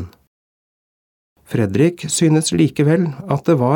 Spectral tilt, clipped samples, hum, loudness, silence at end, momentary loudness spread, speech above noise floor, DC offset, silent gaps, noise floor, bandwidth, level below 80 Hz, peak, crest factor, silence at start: -6 dB/octave; under 0.1%; none; -17 LUFS; 0 s; 6 LU; over 74 dB; under 0.1%; 0.27-1.36 s; under -90 dBFS; 18 kHz; -54 dBFS; -2 dBFS; 16 dB; 0 s